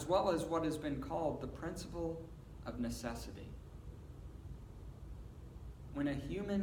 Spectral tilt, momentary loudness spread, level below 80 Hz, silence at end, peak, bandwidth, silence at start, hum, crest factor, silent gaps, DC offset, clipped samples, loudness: -6 dB/octave; 17 LU; -52 dBFS; 0 s; -20 dBFS; 19 kHz; 0 s; none; 20 dB; none; under 0.1%; under 0.1%; -40 LUFS